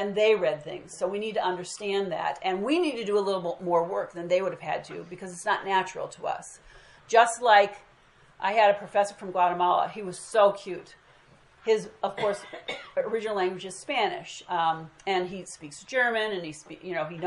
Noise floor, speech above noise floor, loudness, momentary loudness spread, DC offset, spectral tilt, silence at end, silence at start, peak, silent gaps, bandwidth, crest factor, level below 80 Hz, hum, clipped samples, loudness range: -58 dBFS; 31 dB; -27 LUFS; 15 LU; under 0.1%; -3.5 dB/octave; 0 s; 0 s; -6 dBFS; none; 11.5 kHz; 22 dB; -68 dBFS; none; under 0.1%; 6 LU